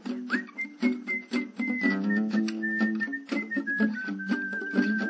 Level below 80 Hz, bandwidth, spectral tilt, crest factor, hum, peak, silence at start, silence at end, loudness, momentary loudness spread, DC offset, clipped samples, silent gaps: -84 dBFS; 8 kHz; -6 dB/octave; 18 dB; none; -12 dBFS; 0 s; 0 s; -29 LUFS; 5 LU; under 0.1%; under 0.1%; none